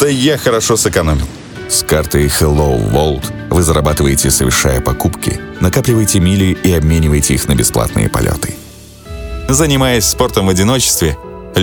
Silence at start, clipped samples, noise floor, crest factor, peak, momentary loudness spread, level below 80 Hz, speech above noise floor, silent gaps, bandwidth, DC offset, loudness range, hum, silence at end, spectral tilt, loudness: 0 s; under 0.1%; -33 dBFS; 12 dB; 0 dBFS; 9 LU; -22 dBFS; 21 dB; none; 19.5 kHz; under 0.1%; 2 LU; none; 0 s; -4.5 dB/octave; -12 LUFS